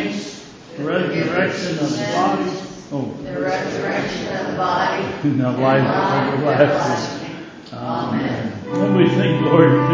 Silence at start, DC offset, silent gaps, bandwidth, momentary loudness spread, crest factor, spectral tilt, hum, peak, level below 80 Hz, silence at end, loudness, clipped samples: 0 s; under 0.1%; none; 7.8 kHz; 13 LU; 18 dB; -6.5 dB/octave; none; 0 dBFS; -52 dBFS; 0 s; -19 LUFS; under 0.1%